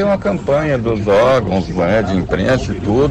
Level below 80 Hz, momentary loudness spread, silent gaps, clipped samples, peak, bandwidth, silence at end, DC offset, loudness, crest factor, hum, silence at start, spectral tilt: -32 dBFS; 5 LU; none; under 0.1%; -6 dBFS; 9.8 kHz; 0 s; under 0.1%; -15 LUFS; 8 dB; none; 0 s; -7 dB/octave